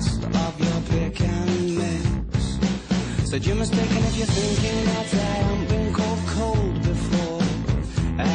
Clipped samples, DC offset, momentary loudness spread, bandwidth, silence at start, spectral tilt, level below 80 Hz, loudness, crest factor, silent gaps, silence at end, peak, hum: under 0.1%; under 0.1%; 3 LU; 10 kHz; 0 s; -6 dB/octave; -32 dBFS; -23 LUFS; 12 dB; none; 0 s; -10 dBFS; none